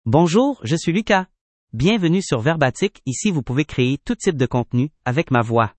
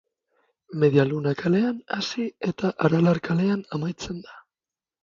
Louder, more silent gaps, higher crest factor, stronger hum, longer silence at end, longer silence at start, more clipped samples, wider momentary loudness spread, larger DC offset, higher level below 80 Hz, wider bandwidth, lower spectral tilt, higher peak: first, -19 LUFS vs -24 LUFS; first, 1.41-1.67 s vs none; about the same, 18 dB vs 20 dB; neither; second, 0.1 s vs 0.65 s; second, 0.05 s vs 0.7 s; neither; second, 6 LU vs 12 LU; neither; first, -46 dBFS vs -60 dBFS; first, 8.8 kHz vs 7.6 kHz; about the same, -6 dB/octave vs -7 dB/octave; first, 0 dBFS vs -4 dBFS